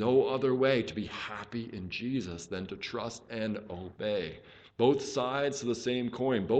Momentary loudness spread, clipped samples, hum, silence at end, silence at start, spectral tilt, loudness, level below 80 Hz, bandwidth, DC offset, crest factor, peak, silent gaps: 12 LU; under 0.1%; none; 0 s; 0 s; -5.5 dB/octave; -32 LUFS; -64 dBFS; 8.8 kHz; under 0.1%; 20 dB; -12 dBFS; none